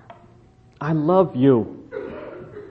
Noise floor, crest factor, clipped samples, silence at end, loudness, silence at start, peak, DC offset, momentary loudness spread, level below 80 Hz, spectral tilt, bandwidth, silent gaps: -51 dBFS; 18 dB; under 0.1%; 0 s; -19 LUFS; 0.1 s; -4 dBFS; under 0.1%; 20 LU; -56 dBFS; -10.5 dB/octave; 6 kHz; none